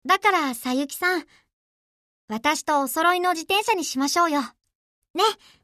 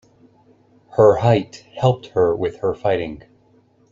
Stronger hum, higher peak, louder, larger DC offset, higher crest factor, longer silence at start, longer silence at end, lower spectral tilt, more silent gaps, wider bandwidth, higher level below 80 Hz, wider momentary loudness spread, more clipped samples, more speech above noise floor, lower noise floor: neither; second, -6 dBFS vs -2 dBFS; second, -22 LUFS vs -18 LUFS; neither; about the same, 18 dB vs 18 dB; second, 0.05 s vs 0.95 s; second, 0.3 s vs 0.7 s; second, -1.5 dB/octave vs -7.5 dB/octave; first, 1.53-2.28 s, 4.75-5.02 s, 5.10-5.14 s vs none; first, 14 kHz vs 7.6 kHz; second, -68 dBFS vs -52 dBFS; second, 7 LU vs 15 LU; neither; first, over 67 dB vs 38 dB; first, under -90 dBFS vs -56 dBFS